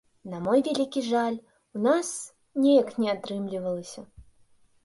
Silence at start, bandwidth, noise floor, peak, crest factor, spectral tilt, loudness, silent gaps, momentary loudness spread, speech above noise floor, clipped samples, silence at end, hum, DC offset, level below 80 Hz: 0.25 s; 11.5 kHz; -60 dBFS; -10 dBFS; 18 dB; -5 dB/octave; -26 LUFS; none; 17 LU; 35 dB; under 0.1%; 0.65 s; none; under 0.1%; -64 dBFS